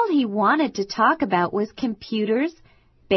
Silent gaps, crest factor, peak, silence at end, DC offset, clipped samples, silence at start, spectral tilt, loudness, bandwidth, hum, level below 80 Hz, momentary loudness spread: none; 16 dB; -6 dBFS; 0 s; under 0.1%; under 0.1%; 0 s; -5.5 dB/octave; -22 LUFS; 6.2 kHz; none; -58 dBFS; 7 LU